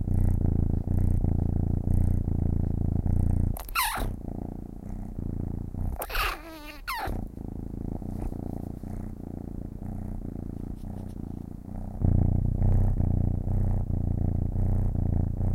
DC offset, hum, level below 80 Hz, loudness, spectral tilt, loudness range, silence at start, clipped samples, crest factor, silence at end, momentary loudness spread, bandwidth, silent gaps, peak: under 0.1%; none; -32 dBFS; -30 LUFS; -6.5 dB/octave; 10 LU; 0 s; under 0.1%; 16 dB; 0 s; 12 LU; 16.5 kHz; none; -10 dBFS